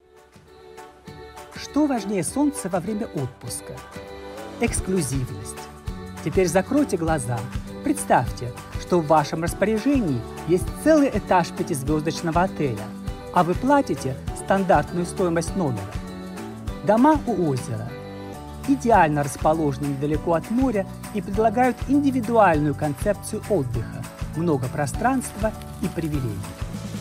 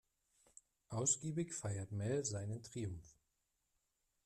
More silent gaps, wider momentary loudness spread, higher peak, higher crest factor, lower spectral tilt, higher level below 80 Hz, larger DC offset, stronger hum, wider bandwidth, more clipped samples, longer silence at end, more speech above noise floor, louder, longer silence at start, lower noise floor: neither; first, 16 LU vs 11 LU; first, -4 dBFS vs -24 dBFS; about the same, 18 dB vs 20 dB; first, -6 dB/octave vs -4.5 dB/octave; first, -40 dBFS vs -72 dBFS; neither; neither; first, 16 kHz vs 12.5 kHz; neither; second, 0 s vs 1.15 s; second, 29 dB vs 44 dB; first, -23 LUFS vs -41 LUFS; second, 0.35 s vs 0.9 s; second, -51 dBFS vs -86 dBFS